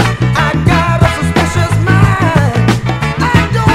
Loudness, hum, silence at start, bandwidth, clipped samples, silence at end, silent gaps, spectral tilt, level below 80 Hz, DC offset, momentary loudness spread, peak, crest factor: -11 LUFS; none; 0 s; 14.5 kHz; 0.6%; 0 s; none; -6 dB/octave; -24 dBFS; under 0.1%; 3 LU; 0 dBFS; 10 dB